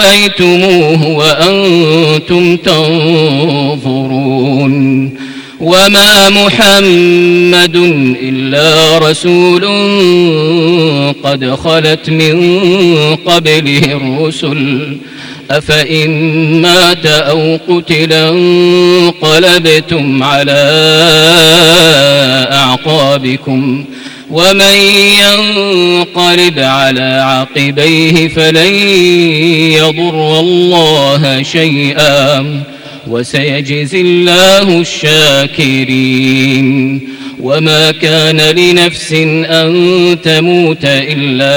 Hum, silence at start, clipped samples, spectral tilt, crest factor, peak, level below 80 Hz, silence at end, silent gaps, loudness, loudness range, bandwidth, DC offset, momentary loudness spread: none; 0 s; 2%; -4.5 dB/octave; 8 dB; 0 dBFS; -42 dBFS; 0 s; none; -6 LUFS; 4 LU; over 20 kHz; under 0.1%; 9 LU